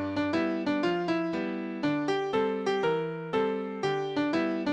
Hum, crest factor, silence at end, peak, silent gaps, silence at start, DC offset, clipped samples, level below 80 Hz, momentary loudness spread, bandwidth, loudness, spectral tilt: none; 14 dB; 0 s; -16 dBFS; none; 0 s; under 0.1%; under 0.1%; -66 dBFS; 3 LU; 9.8 kHz; -29 LUFS; -6.5 dB/octave